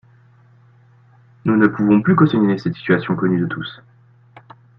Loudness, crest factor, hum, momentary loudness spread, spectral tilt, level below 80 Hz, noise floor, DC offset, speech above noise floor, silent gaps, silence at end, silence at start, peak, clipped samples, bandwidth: -17 LUFS; 18 dB; none; 11 LU; -9.5 dB/octave; -58 dBFS; -50 dBFS; under 0.1%; 34 dB; none; 1.05 s; 1.45 s; 0 dBFS; under 0.1%; 5.8 kHz